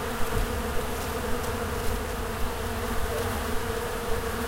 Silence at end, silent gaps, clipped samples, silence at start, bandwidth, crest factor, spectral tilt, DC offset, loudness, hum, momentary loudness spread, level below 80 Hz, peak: 0 s; none; under 0.1%; 0 s; 16 kHz; 16 dB; -4.5 dB/octave; under 0.1%; -30 LUFS; none; 2 LU; -34 dBFS; -12 dBFS